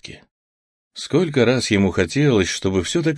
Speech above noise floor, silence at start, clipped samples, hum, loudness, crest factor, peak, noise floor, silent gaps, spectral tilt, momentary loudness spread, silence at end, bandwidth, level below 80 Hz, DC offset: over 72 dB; 0.05 s; under 0.1%; none; -18 LUFS; 16 dB; -2 dBFS; under -90 dBFS; 0.31-0.91 s; -5 dB/octave; 14 LU; 0 s; 10.5 kHz; -48 dBFS; under 0.1%